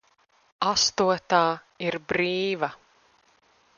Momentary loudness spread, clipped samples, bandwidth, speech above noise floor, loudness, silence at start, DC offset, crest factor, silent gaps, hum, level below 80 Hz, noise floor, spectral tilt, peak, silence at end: 9 LU; under 0.1%; 7.2 kHz; 39 dB; -25 LUFS; 0.6 s; under 0.1%; 22 dB; none; none; -62 dBFS; -64 dBFS; -3 dB/octave; -6 dBFS; 1 s